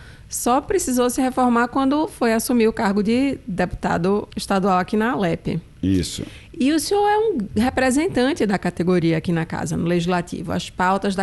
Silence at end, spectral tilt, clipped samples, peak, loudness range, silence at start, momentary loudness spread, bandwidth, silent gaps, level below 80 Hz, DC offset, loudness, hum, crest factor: 0 s; -5.5 dB/octave; under 0.1%; -6 dBFS; 2 LU; 0 s; 7 LU; 12.5 kHz; none; -44 dBFS; under 0.1%; -20 LUFS; none; 14 dB